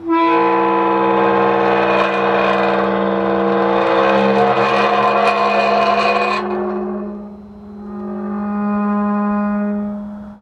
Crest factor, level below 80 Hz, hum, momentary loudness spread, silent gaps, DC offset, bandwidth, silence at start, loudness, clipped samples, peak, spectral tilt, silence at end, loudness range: 14 dB; -50 dBFS; none; 13 LU; none; under 0.1%; 9.2 kHz; 0 s; -15 LUFS; under 0.1%; -2 dBFS; -6.5 dB/octave; 0.05 s; 7 LU